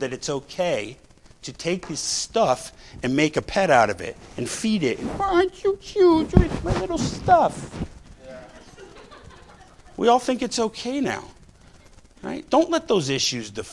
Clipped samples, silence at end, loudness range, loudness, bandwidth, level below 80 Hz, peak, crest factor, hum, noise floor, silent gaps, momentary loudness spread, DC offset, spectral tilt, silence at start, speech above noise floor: under 0.1%; 0 s; 5 LU; -22 LUFS; 12 kHz; -38 dBFS; 0 dBFS; 24 dB; none; -50 dBFS; none; 17 LU; under 0.1%; -4.5 dB/octave; 0 s; 27 dB